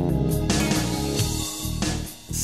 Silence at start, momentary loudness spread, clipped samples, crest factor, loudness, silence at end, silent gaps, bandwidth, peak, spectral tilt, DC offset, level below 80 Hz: 0 s; 6 LU; under 0.1%; 14 dB; -25 LUFS; 0 s; none; 14 kHz; -10 dBFS; -4.5 dB/octave; 0.3%; -34 dBFS